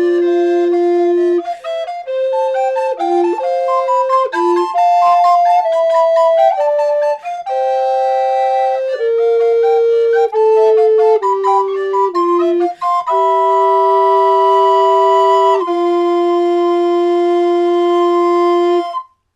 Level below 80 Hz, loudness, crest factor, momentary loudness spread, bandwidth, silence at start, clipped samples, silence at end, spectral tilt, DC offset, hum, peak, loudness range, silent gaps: -68 dBFS; -13 LUFS; 10 dB; 6 LU; 8.4 kHz; 0 s; under 0.1%; 0.3 s; -3.5 dB/octave; under 0.1%; none; -2 dBFS; 4 LU; none